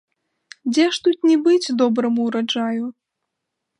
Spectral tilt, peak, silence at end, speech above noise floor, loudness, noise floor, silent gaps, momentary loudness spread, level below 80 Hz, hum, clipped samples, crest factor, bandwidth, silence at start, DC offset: -4 dB/octave; -6 dBFS; 0.9 s; 61 dB; -19 LUFS; -79 dBFS; none; 9 LU; -74 dBFS; none; under 0.1%; 16 dB; 11 kHz; 0.65 s; under 0.1%